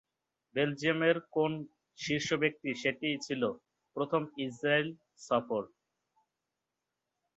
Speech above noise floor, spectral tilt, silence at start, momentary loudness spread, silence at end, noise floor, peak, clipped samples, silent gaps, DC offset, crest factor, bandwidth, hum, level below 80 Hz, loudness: 55 dB; -5 dB/octave; 0.55 s; 13 LU; 1.7 s; -88 dBFS; -12 dBFS; under 0.1%; none; under 0.1%; 22 dB; 8.2 kHz; none; -74 dBFS; -33 LUFS